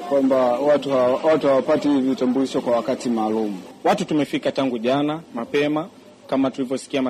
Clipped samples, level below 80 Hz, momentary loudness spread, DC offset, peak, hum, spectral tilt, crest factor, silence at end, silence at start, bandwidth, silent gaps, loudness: under 0.1%; -62 dBFS; 7 LU; under 0.1%; -8 dBFS; none; -6 dB/octave; 12 dB; 0 s; 0 s; 13.5 kHz; none; -21 LUFS